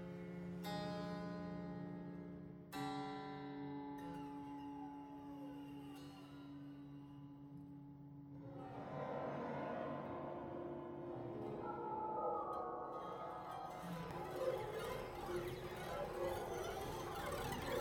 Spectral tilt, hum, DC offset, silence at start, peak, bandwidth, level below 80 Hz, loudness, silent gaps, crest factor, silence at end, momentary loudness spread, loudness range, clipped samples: -6 dB/octave; none; under 0.1%; 0 s; -30 dBFS; 16.5 kHz; -66 dBFS; -48 LUFS; none; 18 dB; 0 s; 11 LU; 8 LU; under 0.1%